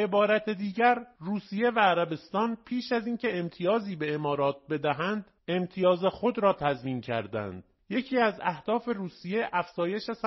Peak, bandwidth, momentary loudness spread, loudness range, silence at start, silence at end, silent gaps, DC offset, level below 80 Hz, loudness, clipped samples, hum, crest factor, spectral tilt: -10 dBFS; 6 kHz; 9 LU; 3 LU; 0 s; 0 s; none; under 0.1%; -66 dBFS; -29 LUFS; under 0.1%; none; 18 dB; -4 dB/octave